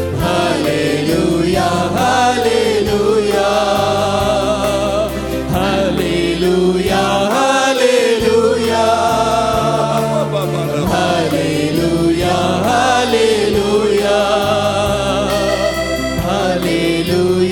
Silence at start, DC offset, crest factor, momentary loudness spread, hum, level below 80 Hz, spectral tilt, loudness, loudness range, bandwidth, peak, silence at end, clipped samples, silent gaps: 0 s; under 0.1%; 14 dB; 4 LU; none; -34 dBFS; -5 dB/octave; -14 LUFS; 2 LU; 19 kHz; 0 dBFS; 0 s; under 0.1%; none